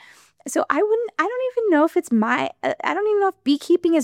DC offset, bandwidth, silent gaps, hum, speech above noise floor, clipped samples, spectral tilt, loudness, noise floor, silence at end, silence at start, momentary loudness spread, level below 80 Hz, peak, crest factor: under 0.1%; 15.5 kHz; none; none; 19 dB; under 0.1%; -4.5 dB/octave; -21 LUFS; -39 dBFS; 0 s; 0.45 s; 6 LU; -72 dBFS; -2 dBFS; 18 dB